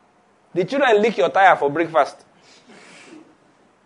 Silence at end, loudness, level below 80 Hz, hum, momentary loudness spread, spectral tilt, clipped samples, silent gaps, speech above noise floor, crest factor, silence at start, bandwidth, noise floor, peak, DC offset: 1.75 s; -18 LUFS; -74 dBFS; none; 10 LU; -5 dB/octave; under 0.1%; none; 40 dB; 20 dB; 0.55 s; 10.5 kHz; -57 dBFS; 0 dBFS; under 0.1%